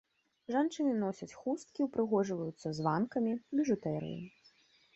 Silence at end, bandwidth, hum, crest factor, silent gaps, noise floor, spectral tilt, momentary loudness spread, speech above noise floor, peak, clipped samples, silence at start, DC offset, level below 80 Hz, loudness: 0.65 s; 8.2 kHz; none; 18 dB; none; -67 dBFS; -7 dB/octave; 9 LU; 33 dB; -16 dBFS; under 0.1%; 0.5 s; under 0.1%; -74 dBFS; -35 LUFS